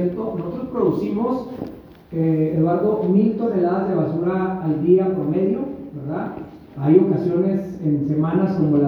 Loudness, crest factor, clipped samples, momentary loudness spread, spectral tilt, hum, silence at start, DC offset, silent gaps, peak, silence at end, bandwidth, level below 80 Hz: -20 LUFS; 18 dB; under 0.1%; 13 LU; -11 dB/octave; none; 0 s; under 0.1%; none; -2 dBFS; 0 s; 5.6 kHz; -52 dBFS